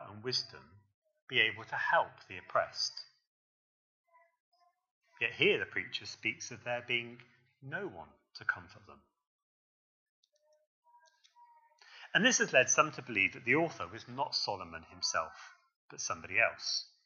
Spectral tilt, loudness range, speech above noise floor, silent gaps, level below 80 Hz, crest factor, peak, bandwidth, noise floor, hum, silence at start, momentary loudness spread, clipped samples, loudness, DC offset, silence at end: -2 dB/octave; 14 LU; 32 dB; 0.94-1.02 s, 1.22-1.27 s, 3.27-4.04 s, 4.40-4.52 s, 4.91-5.01 s, 9.27-10.23 s, 10.67-10.83 s, 15.76-15.89 s; -78 dBFS; 26 dB; -12 dBFS; 7.6 kHz; -66 dBFS; none; 0 s; 17 LU; under 0.1%; -33 LUFS; under 0.1%; 0.2 s